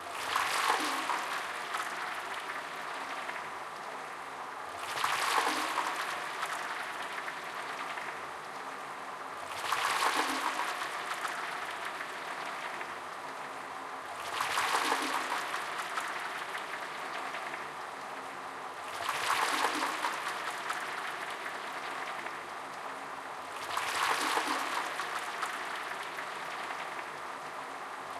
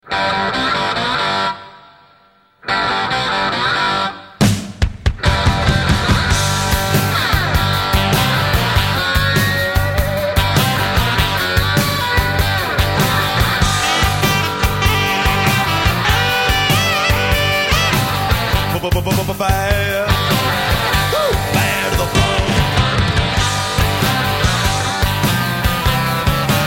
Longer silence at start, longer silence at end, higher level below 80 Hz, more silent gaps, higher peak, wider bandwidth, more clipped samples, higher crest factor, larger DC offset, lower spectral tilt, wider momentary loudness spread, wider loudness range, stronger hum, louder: about the same, 0 s vs 0.05 s; about the same, 0 s vs 0 s; second, -80 dBFS vs -24 dBFS; neither; second, -16 dBFS vs 0 dBFS; about the same, 16 kHz vs 17 kHz; neither; first, 20 dB vs 14 dB; neither; second, -0.5 dB/octave vs -4 dB/octave; first, 11 LU vs 3 LU; about the same, 5 LU vs 3 LU; neither; second, -35 LUFS vs -15 LUFS